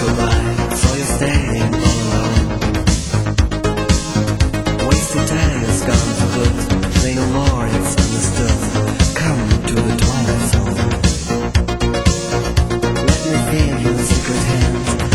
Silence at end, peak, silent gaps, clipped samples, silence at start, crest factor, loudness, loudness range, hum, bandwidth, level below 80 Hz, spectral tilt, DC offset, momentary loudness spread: 0 s; 0 dBFS; none; under 0.1%; 0 s; 16 dB; -16 LUFS; 1 LU; none; 16 kHz; -20 dBFS; -5 dB/octave; under 0.1%; 2 LU